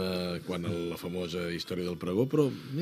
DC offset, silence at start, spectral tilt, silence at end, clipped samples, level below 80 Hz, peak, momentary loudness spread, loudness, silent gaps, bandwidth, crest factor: under 0.1%; 0 s; -6.5 dB/octave; 0 s; under 0.1%; -62 dBFS; -12 dBFS; 7 LU; -32 LUFS; none; 15 kHz; 20 dB